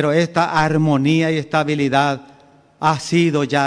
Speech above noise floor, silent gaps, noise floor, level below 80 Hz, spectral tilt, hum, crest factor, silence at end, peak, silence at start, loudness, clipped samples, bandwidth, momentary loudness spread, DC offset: 33 dB; none; -49 dBFS; -54 dBFS; -6 dB/octave; none; 14 dB; 0 s; -2 dBFS; 0 s; -17 LUFS; under 0.1%; 10.5 kHz; 4 LU; under 0.1%